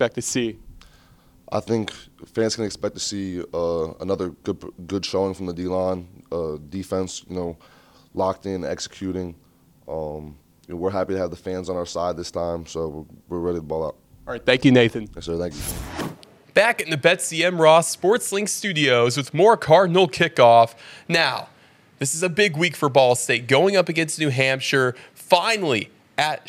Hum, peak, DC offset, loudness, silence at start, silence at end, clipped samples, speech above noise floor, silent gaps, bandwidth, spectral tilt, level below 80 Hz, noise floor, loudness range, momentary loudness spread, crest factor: none; 0 dBFS; under 0.1%; -21 LUFS; 0 s; 0 s; under 0.1%; 32 dB; none; 16.5 kHz; -4 dB/octave; -52 dBFS; -53 dBFS; 11 LU; 16 LU; 22 dB